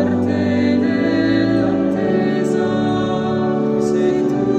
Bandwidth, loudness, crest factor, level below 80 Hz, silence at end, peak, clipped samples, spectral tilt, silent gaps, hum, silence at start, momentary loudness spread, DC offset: 9.2 kHz; -17 LUFS; 12 dB; -48 dBFS; 0 s; -4 dBFS; under 0.1%; -7.5 dB/octave; none; none; 0 s; 2 LU; under 0.1%